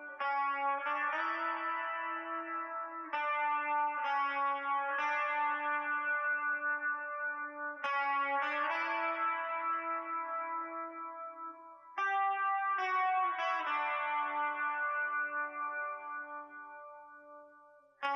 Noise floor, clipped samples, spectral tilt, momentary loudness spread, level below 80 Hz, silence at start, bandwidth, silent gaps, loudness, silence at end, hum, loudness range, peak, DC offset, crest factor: -61 dBFS; under 0.1%; -1.5 dB/octave; 12 LU; under -90 dBFS; 0 s; 6.8 kHz; none; -35 LUFS; 0 s; none; 4 LU; -20 dBFS; under 0.1%; 16 dB